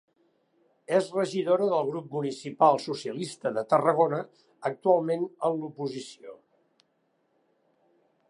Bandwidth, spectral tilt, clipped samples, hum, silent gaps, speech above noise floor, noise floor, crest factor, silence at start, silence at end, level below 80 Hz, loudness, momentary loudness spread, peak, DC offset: 11 kHz; -6 dB/octave; under 0.1%; none; none; 46 dB; -73 dBFS; 22 dB; 0.9 s; 1.95 s; -82 dBFS; -27 LUFS; 12 LU; -8 dBFS; under 0.1%